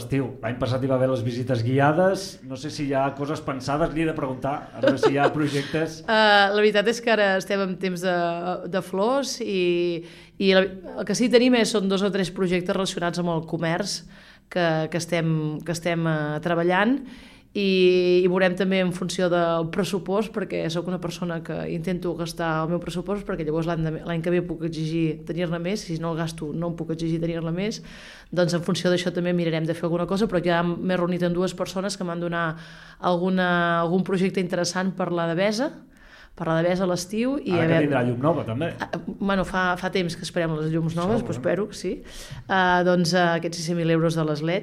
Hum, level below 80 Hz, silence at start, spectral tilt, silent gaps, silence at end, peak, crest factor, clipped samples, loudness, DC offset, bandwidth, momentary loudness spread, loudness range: none; -50 dBFS; 0 s; -5.5 dB/octave; none; 0 s; -4 dBFS; 20 dB; under 0.1%; -24 LUFS; under 0.1%; 14.5 kHz; 9 LU; 6 LU